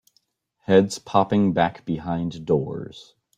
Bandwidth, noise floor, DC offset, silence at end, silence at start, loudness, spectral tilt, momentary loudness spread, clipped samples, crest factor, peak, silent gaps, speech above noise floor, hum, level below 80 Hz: 11 kHz; -68 dBFS; under 0.1%; 0.35 s; 0.7 s; -22 LUFS; -6.5 dB/octave; 14 LU; under 0.1%; 20 dB; -2 dBFS; none; 46 dB; none; -56 dBFS